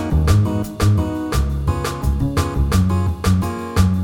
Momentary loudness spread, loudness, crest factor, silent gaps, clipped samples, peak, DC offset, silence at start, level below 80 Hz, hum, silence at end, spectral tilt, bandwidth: 5 LU; -19 LUFS; 14 dB; none; under 0.1%; -4 dBFS; under 0.1%; 0 s; -24 dBFS; none; 0 s; -6.5 dB/octave; 16.5 kHz